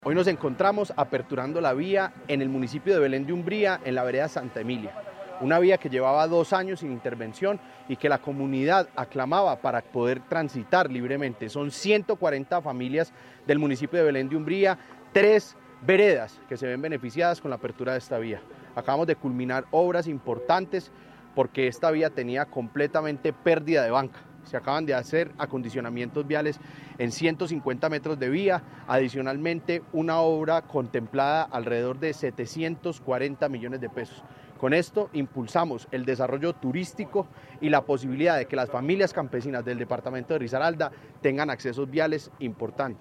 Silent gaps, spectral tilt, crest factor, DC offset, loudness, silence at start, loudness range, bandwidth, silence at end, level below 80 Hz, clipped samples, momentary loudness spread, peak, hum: none; -6.5 dB/octave; 20 dB; under 0.1%; -27 LUFS; 0 s; 4 LU; 12 kHz; 0.05 s; -68 dBFS; under 0.1%; 9 LU; -6 dBFS; none